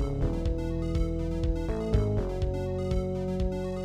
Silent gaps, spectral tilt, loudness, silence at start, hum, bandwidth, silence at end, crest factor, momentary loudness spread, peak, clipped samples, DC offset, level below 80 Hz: none; -8.5 dB/octave; -31 LUFS; 0 s; none; 10 kHz; 0 s; 18 dB; 3 LU; -10 dBFS; under 0.1%; under 0.1%; -32 dBFS